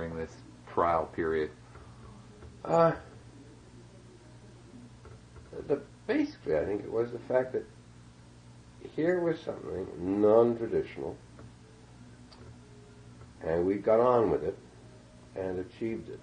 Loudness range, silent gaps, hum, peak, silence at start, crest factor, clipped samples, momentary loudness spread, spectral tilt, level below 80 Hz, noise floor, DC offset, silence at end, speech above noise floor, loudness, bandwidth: 6 LU; none; 60 Hz at -55 dBFS; -10 dBFS; 0 s; 22 dB; under 0.1%; 26 LU; -7.5 dB/octave; -60 dBFS; -53 dBFS; under 0.1%; 0 s; 24 dB; -30 LUFS; 10 kHz